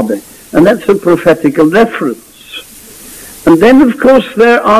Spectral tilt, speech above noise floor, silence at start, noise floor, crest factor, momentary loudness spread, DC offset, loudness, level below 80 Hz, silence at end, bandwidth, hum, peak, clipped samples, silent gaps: -6 dB/octave; 25 dB; 0 s; -32 dBFS; 8 dB; 20 LU; under 0.1%; -8 LUFS; -42 dBFS; 0 s; 15.5 kHz; none; 0 dBFS; 0.3%; none